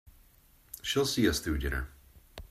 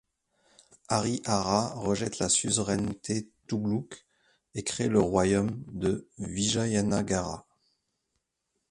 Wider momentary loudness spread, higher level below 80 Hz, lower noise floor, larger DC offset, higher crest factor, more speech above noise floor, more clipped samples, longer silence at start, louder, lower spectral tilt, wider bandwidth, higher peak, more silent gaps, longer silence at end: first, 22 LU vs 11 LU; first, -42 dBFS vs -54 dBFS; second, -61 dBFS vs -81 dBFS; neither; about the same, 18 dB vs 22 dB; second, 32 dB vs 53 dB; neither; second, 0.05 s vs 0.9 s; about the same, -31 LUFS vs -29 LUFS; about the same, -4 dB/octave vs -4.5 dB/octave; first, 16 kHz vs 11.5 kHz; second, -14 dBFS vs -8 dBFS; neither; second, 0.05 s vs 1.3 s